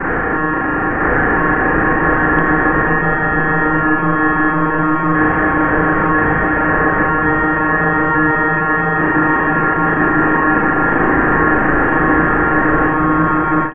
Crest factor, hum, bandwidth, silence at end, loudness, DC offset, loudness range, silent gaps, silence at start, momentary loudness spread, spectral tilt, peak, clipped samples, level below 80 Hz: 14 dB; none; 3.5 kHz; 0 s; -14 LUFS; under 0.1%; 1 LU; none; 0 s; 2 LU; -11 dB/octave; 0 dBFS; under 0.1%; -30 dBFS